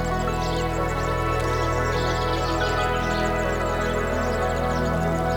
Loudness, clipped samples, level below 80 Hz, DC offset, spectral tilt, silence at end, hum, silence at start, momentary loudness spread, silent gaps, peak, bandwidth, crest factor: -24 LUFS; under 0.1%; -32 dBFS; under 0.1%; -5.5 dB/octave; 0 s; none; 0 s; 2 LU; none; -10 dBFS; 18 kHz; 14 dB